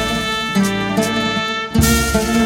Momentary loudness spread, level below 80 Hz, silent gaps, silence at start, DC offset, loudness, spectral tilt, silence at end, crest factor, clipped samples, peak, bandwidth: 4 LU; -28 dBFS; none; 0 s; under 0.1%; -17 LUFS; -4 dB/octave; 0 s; 16 dB; under 0.1%; -2 dBFS; 17 kHz